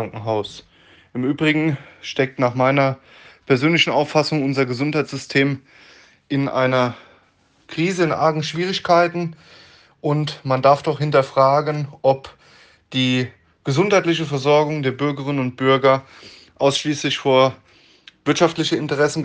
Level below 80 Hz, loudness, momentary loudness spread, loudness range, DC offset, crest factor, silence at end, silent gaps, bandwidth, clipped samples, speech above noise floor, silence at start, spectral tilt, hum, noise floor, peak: -62 dBFS; -19 LUFS; 9 LU; 3 LU; under 0.1%; 18 dB; 0 s; none; 9.6 kHz; under 0.1%; 40 dB; 0 s; -5.5 dB/octave; none; -58 dBFS; 0 dBFS